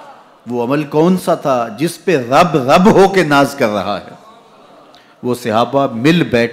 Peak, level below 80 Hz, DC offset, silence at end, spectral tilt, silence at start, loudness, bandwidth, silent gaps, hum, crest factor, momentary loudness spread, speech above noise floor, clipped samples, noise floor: -2 dBFS; -46 dBFS; under 0.1%; 0 s; -6 dB/octave; 0 s; -13 LUFS; 16 kHz; none; none; 12 dB; 11 LU; 30 dB; under 0.1%; -43 dBFS